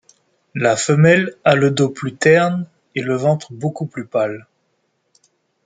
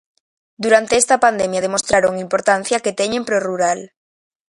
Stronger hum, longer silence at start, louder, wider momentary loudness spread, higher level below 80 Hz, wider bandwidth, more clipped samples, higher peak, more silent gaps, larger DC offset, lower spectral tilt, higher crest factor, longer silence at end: neither; about the same, 0.55 s vs 0.6 s; about the same, -17 LUFS vs -17 LUFS; first, 13 LU vs 6 LU; second, -60 dBFS vs -54 dBFS; second, 9.4 kHz vs 11.5 kHz; neither; about the same, 0 dBFS vs 0 dBFS; neither; neither; first, -5.5 dB/octave vs -2.5 dB/octave; about the same, 18 dB vs 18 dB; first, 1.25 s vs 0.65 s